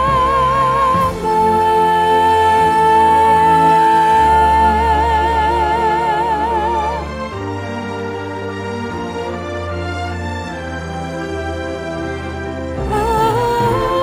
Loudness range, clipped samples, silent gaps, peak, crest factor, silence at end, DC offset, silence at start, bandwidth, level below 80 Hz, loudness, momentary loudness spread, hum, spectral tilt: 12 LU; under 0.1%; none; -2 dBFS; 14 dB; 0 s; under 0.1%; 0 s; 16 kHz; -30 dBFS; -15 LUFS; 13 LU; none; -5.5 dB/octave